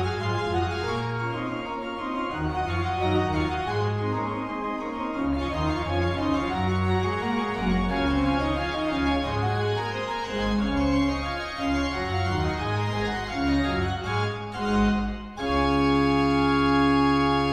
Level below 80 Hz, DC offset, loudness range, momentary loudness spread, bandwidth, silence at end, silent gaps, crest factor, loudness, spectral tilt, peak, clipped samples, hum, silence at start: -38 dBFS; under 0.1%; 3 LU; 8 LU; 10.5 kHz; 0 s; none; 14 dB; -26 LUFS; -6.5 dB/octave; -10 dBFS; under 0.1%; none; 0 s